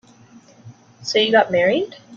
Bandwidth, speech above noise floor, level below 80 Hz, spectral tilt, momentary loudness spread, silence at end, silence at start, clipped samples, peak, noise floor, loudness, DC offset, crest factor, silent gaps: 7.4 kHz; 30 dB; -64 dBFS; -4 dB/octave; 8 LU; 0 s; 0.65 s; under 0.1%; -2 dBFS; -48 dBFS; -17 LUFS; under 0.1%; 18 dB; none